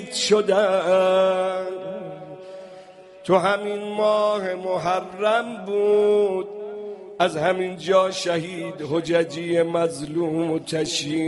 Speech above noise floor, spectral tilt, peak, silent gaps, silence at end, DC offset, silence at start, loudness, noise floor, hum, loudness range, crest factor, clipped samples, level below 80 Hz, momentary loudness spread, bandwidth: 23 dB; -4.5 dB/octave; -4 dBFS; none; 0 s; under 0.1%; 0 s; -22 LUFS; -44 dBFS; none; 2 LU; 18 dB; under 0.1%; -64 dBFS; 15 LU; 11.5 kHz